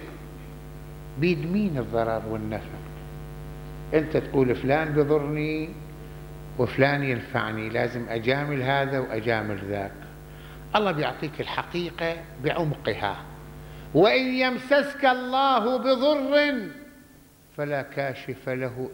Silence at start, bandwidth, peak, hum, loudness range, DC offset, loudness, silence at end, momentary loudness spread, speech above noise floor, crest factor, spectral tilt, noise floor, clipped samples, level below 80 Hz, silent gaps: 0 s; 16.5 kHz; -6 dBFS; none; 6 LU; under 0.1%; -25 LUFS; 0 s; 20 LU; 28 dB; 22 dB; -7 dB/octave; -53 dBFS; under 0.1%; -48 dBFS; none